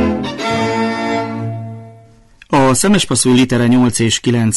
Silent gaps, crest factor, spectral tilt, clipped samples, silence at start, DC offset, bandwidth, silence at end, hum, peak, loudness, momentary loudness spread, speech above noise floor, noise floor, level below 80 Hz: none; 12 dB; -4.5 dB/octave; under 0.1%; 0 s; under 0.1%; 12 kHz; 0 s; none; -2 dBFS; -14 LUFS; 12 LU; 32 dB; -44 dBFS; -40 dBFS